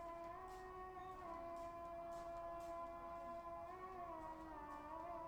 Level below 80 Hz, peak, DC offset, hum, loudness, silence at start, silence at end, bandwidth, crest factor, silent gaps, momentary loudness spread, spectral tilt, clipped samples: -68 dBFS; -40 dBFS; under 0.1%; none; -52 LUFS; 0 s; 0 s; over 20 kHz; 12 dB; none; 3 LU; -6 dB/octave; under 0.1%